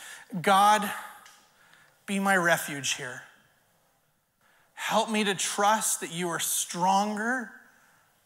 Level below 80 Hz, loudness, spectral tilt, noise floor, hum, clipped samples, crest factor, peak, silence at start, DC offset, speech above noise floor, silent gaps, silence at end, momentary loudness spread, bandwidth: -82 dBFS; -26 LUFS; -2.5 dB/octave; -71 dBFS; none; under 0.1%; 18 dB; -10 dBFS; 0 s; under 0.1%; 44 dB; none; 0.65 s; 16 LU; 16 kHz